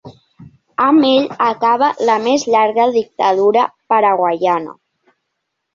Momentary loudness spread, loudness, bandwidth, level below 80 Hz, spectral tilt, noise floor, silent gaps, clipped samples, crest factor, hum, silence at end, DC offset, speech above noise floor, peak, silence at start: 5 LU; -14 LUFS; 7.6 kHz; -62 dBFS; -4.5 dB/octave; -74 dBFS; none; under 0.1%; 12 dB; none; 1 s; under 0.1%; 60 dB; -2 dBFS; 0.05 s